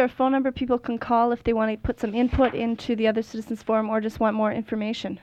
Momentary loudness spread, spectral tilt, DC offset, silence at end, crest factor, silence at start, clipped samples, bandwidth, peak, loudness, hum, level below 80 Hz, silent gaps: 7 LU; -7 dB/octave; under 0.1%; 0.05 s; 14 dB; 0 s; under 0.1%; 8.8 kHz; -8 dBFS; -24 LUFS; none; -42 dBFS; none